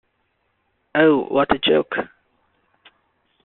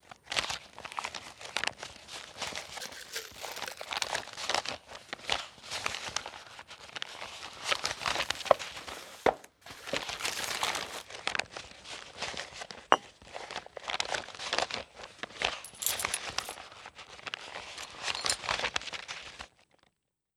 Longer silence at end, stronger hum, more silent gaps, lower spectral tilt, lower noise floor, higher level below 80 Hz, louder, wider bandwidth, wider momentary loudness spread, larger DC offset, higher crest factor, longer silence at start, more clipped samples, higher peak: first, 1.4 s vs 0.9 s; neither; neither; first, -2.5 dB/octave vs -0.5 dB/octave; second, -69 dBFS vs -76 dBFS; first, -56 dBFS vs -64 dBFS; first, -19 LUFS vs -35 LUFS; second, 4.2 kHz vs over 20 kHz; second, 11 LU vs 14 LU; neither; second, 20 dB vs 36 dB; first, 0.95 s vs 0.05 s; neither; about the same, -2 dBFS vs -2 dBFS